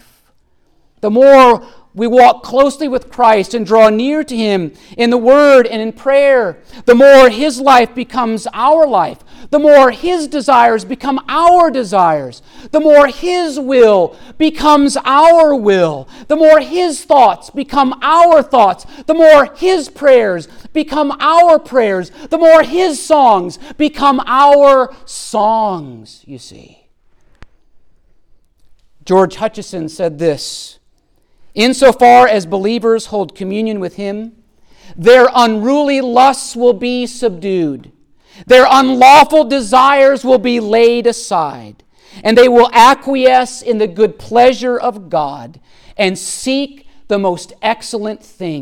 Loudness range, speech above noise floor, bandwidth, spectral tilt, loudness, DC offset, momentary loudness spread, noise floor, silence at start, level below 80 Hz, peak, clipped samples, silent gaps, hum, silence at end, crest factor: 9 LU; 43 dB; 16.5 kHz; -4.5 dB/octave; -10 LUFS; under 0.1%; 14 LU; -54 dBFS; 1.05 s; -44 dBFS; 0 dBFS; under 0.1%; none; none; 0 s; 10 dB